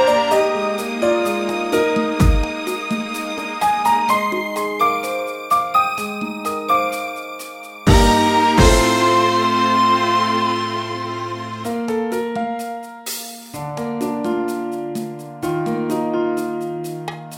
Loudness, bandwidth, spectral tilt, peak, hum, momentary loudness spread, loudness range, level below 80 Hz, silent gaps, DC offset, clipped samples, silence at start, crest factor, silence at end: -19 LUFS; 17 kHz; -5 dB/octave; -2 dBFS; none; 13 LU; 9 LU; -30 dBFS; none; under 0.1%; under 0.1%; 0 s; 18 dB; 0 s